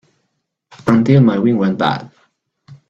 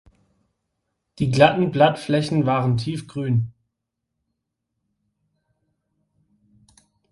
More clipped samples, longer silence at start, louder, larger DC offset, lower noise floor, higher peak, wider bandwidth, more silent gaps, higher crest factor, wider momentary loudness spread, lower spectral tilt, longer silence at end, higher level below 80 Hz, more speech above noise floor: neither; second, 0.85 s vs 1.2 s; first, -14 LUFS vs -20 LUFS; neither; second, -71 dBFS vs -80 dBFS; about the same, 0 dBFS vs 0 dBFS; second, 7.8 kHz vs 11.5 kHz; neither; second, 16 dB vs 24 dB; about the same, 11 LU vs 11 LU; first, -8.5 dB/octave vs -7 dB/octave; second, 0.15 s vs 3.6 s; about the same, -52 dBFS vs -56 dBFS; about the same, 58 dB vs 61 dB